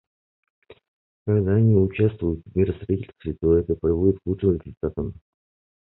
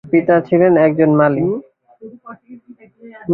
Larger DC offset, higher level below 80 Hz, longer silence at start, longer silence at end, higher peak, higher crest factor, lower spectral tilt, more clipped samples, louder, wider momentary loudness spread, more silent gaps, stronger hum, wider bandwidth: neither; first, -38 dBFS vs -56 dBFS; first, 0.7 s vs 0.05 s; first, 0.7 s vs 0 s; second, -6 dBFS vs -2 dBFS; about the same, 16 dB vs 14 dB; first, -13.5 dB/octave vs -12 dB/octave; neither; second, -23 LUFS vs -13 LUFS; second, 11 LU vs 16 LU; first, 0.88-1.26 s vs none; neither; about the same, 4 kHz vs 4 kHz